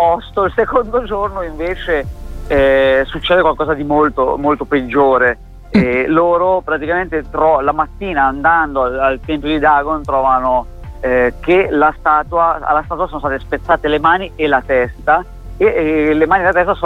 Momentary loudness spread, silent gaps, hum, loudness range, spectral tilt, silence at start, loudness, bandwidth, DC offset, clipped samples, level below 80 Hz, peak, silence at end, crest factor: 7 LU; none; none; 1 LU; -7.5 dB/octave; 0 s; -14 LUFS; 8.6 kHz; under 0.1%; under 0.1%; -32 dBFS; 0 dBFS; 0 s; 14 dB